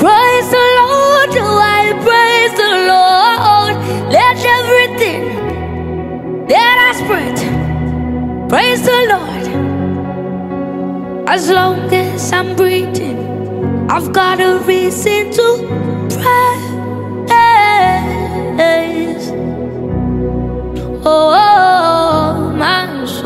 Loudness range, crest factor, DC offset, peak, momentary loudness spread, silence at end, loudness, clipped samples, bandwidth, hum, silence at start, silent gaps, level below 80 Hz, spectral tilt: 5 LU; 12 dB; under 0.1%; 0 dBFS; 12 LU; 0 s; -12 LUFS; under 0.1%; 16.5 kHz; none; 0 s; none; -34 dBFS; -4.5 dB/octave